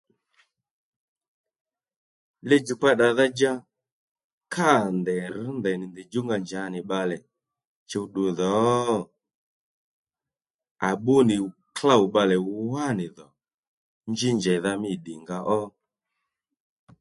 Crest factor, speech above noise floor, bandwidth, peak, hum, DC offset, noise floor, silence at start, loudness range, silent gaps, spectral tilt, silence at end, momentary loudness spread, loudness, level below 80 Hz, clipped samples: 22 dB; over 66 dB; 11.5 kHz; -4 dBFS; none; under 0.1%; under -90 dBFS; 2.45 s; 5 LU; 3.92-4.15 s, 4.24-4.41 s, 7.67-7.86 s, 9.35-10.05 s, 10.54-10.59 s, 10.71-10.75 s, 13.54-14.01 s; -5.5 dB/octave; 1.3 s; 13 LU; -24 LUFS; -66 dBFS; under 0.1%